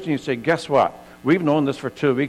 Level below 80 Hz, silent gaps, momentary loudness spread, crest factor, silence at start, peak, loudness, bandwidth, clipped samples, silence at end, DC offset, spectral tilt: -58 dBFS; none; 6 LU; 14 dB; 0 s; -6 dBFS; -21 LUFS; 13 kHz; under 0.1%; 0 s; under 0.1%; -6.5 dB/octave